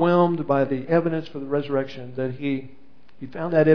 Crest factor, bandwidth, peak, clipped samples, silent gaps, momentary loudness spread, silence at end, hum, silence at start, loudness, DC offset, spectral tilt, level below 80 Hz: 18 dB; 5.4 kHz; -4 dBFS; under 0.1%; none; 11 LU; 0 s; none; 0 s; -24 LUFS; 1%; -9.5 dB/octave; -66 dBFS